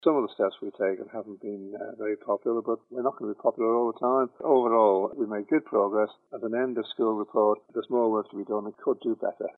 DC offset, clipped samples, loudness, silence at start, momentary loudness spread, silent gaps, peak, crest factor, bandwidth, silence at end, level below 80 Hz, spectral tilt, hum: under 0.1%; under 0.1%; -27 LUFS; 0.05 s; 11 LU; none; -8 dBFS; 18 dB; 4.2 kHz; 0.05 s; -88 dBFS; -9 dB/octave; none